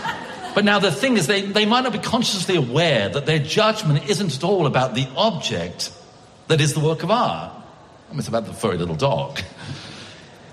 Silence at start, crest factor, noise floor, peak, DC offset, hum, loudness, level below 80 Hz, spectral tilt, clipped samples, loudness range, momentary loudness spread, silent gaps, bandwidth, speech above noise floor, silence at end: 0 s; 18 dB; -46 dBFS; -4 dBFS; under 0.1%; none; -20 LUFS; -54 dBFS; -4.5 dB/octave; under 0.1%; 5 LU; 13 LU; none; 13.5 kHz; 26 dB; 0 s